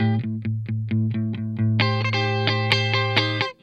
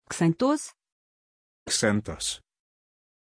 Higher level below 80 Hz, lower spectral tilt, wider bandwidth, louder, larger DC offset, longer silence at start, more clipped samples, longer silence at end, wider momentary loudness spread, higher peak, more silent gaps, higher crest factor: about the same, -62 dBFS vs -58 dBFS; first, -6.5 dB/octave vs -4 dB/octave; second, 7.8 kHz vs 10.5 kHz; first, -22 LUFS vs -26 LUFS; neither; about the same, 0 s vs 0.1 s; neither; second, 0.1 s vs 0.95 s; second, 8 LU vs 16 LU; first, -2 dBFS vs -8 dBFS; second, none vs 0.92-1.66 s; about the same, 22 dB vs 20 dB